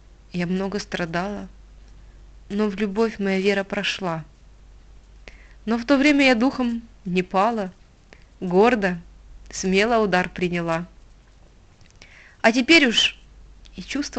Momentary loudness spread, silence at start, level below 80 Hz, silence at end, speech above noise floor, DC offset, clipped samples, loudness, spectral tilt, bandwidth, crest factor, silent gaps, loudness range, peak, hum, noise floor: 18 LU; 0.35 s; -48 dBFS; 0 s; 30 dB; under 0.1%; under 0.1%; -21 LUFS; -4.5 dB/octave; 9 kHz; 22 dB; none; 5 LU; -2 dBFS; none; -51 dBFS